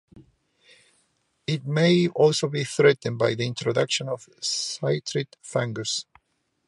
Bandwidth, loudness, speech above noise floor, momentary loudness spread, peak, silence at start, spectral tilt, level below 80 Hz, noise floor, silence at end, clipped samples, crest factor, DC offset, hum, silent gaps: 11.5 kHz; -24 LUFS; 48 dB; 10 LU; -6 dBFS; 0.15 s; -4.5 dB/octave; -68 dBFS; -72 dBFS; 0.65 s; under 0.1%; 20 dB; under 0.1%; none; none